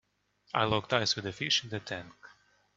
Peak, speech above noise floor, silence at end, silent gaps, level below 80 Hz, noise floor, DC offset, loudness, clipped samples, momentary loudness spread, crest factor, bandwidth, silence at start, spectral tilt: -8 dBFS; 35 dB; 0.5 s; none; -66 dBFS; -67 dBFS; under 0.1%; -31 LUFS; under 0.1%; 12 LU; 26 dB; 8 kHz; 0.55 s; -3.5 dB/octave